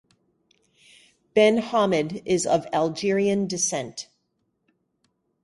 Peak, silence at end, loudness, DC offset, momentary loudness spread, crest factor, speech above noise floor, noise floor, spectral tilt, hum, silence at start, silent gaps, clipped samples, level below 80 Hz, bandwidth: -6 dBFS; 1.4 s; -23 LUFS; under 0.1%; 12 LU; 18 dB; 51 dB; -74 dBFS; -4 dB/octave; none; 1.35 s; none; under 0.1%; -64 dBFS; 11.5 kHz